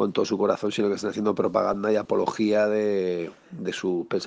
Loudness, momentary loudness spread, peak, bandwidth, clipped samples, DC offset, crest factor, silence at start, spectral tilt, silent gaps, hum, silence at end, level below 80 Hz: -25 LUFS; 7 LU; -6 dBFS; 9.4 kHz; under 0.1%; under 0.1%; 18 dB; 0 s; -5.5 dB/octave; none; none; 0 s; -64 dBFS